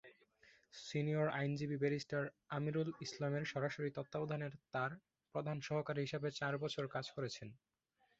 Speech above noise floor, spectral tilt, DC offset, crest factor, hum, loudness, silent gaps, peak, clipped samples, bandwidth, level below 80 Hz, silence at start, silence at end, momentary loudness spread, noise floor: 39 dB; -5.5 dB/octave; under 0.1%; 18 dB; none; -42 LUFS; none; -24 dBFS; under 0.1%; 8 kHz; -78 dBFS; 0.05 s; 0.65 s; 7 LU; -80 dBFS